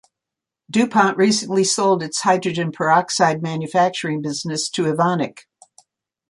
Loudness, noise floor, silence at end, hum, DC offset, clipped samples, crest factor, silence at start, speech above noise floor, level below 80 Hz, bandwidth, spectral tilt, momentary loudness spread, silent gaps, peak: -19 LUFS; -86 dBFS; 0.9 s; none; under 0.1%; under 0.1%; 18 dB; 0.7 s; 67 dB; -66 dBFS; 11.5 kHz; -4 dB/octave; 8 LU; none; -2 dBFS